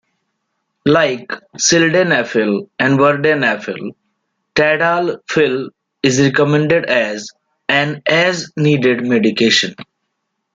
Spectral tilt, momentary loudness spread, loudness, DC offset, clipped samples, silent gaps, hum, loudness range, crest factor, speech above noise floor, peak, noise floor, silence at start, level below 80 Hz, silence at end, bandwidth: -4 dB/octave; 11 LU; -14 LUFS; under 0.1%; under 0.1%; none; none; 2 LU; 14 dB; 58 dB; 0 dBFS; -72 dBFS; 0.85 s; -56 dBFS; 0.7 s; 9.4 kHz